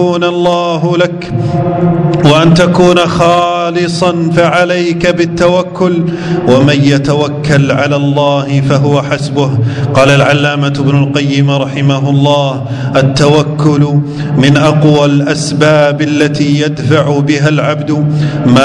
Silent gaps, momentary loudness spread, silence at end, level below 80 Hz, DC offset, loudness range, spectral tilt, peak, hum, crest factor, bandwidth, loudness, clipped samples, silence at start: none; 5 LU; 0 s; -38 dBFS; under 0.1%; 1 LU; -6.5 dB/octave; 0 dBFS; none; 8 dB; 10.5 kHz; -9 LUFS; 2%; 0 s